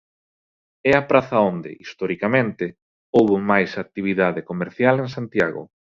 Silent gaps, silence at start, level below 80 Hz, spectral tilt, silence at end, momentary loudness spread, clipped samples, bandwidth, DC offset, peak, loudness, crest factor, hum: 2.82-3.13 s; 0.85 s; -56 dBFS; -7.5 dB/octave; 0.3 s; 12 LU; under 0.1%; 7.6 kHz; under 0.1%; -2 dBFS; -20 LUFS; 20 dB; none